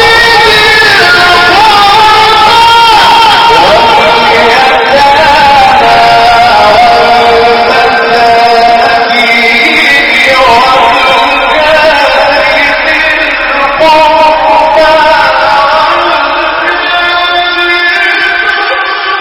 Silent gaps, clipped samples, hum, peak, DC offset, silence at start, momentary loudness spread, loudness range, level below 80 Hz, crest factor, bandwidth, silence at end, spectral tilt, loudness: none; 10%; none; 0 dBFS; 0.6%; 0 s; 5 LU; 3 LU; -32 dBFS; 4 dB; over 20 kHz; 0 s; -2.5 dB/octave; -3 LUFS